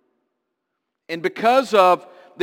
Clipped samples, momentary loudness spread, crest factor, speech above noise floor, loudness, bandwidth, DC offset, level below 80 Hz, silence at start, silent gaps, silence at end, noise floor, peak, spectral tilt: under 0.1%; 11 LU; 18 dB; 61 dB; -18 LUFS; 17 kHz; under 0.1%; -72 dBFS; 1.1 s; none; 0 s; -78 dBFS; -2 dBFS; -4.5 dB/octave